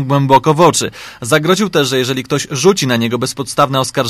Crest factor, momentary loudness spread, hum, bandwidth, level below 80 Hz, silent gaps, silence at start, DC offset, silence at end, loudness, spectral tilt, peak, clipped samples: 14 dB; 7 LU; none; 15.5 kHz; -50 dBFS; none; 0 s; under 0.1%; 0 s; -13 LUFS; -4.5 dB/octave; 0 dBFS; 0.2%